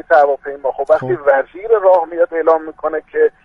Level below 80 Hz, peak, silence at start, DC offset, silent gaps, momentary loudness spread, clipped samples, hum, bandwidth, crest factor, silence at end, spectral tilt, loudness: -54 dBFS; 0 dBFS; 0.1 s; under 0.1%; none; 9 LU; under 0.1%; none; 5.6 kHz; 14 dB; 0.15 s; -7.5 dB/octave; -15 LUFS